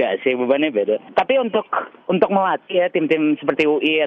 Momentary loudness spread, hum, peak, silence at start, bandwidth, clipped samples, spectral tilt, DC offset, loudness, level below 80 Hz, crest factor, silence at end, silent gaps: 4 LU; none; -4 dBFS; 0 s; 6.4 kHz; under 0.1%; -7 dB/octave; under 0.1%; -19 LUFS; -64 dBFS; 16 dB; 0 s; none